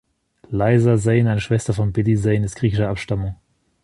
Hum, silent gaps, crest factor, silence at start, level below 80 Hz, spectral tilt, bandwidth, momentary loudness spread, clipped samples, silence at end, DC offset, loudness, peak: none; none; 16 dB; 0.5 s; -40 dBFS; -7.5 dB/octave; 11.5 kHz; 9 LU; under 0.1%; 0.5 s; under 0.1%; -19 LUFS; -4 dBFS